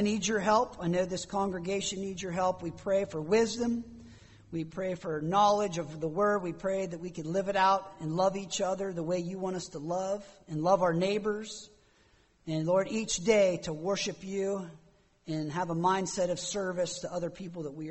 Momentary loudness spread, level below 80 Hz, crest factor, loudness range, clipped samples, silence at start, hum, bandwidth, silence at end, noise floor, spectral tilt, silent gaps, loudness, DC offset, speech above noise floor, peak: 12 LU; -60 dBFS; 20 dB; 3 LU; under 0.1%; 0 s; none; 8.4 kHz; 0 s; -65 dBFS; -4.5 dB/octave; none; -31 LUFS; under 0.1%; 34 dB; -12 dBFS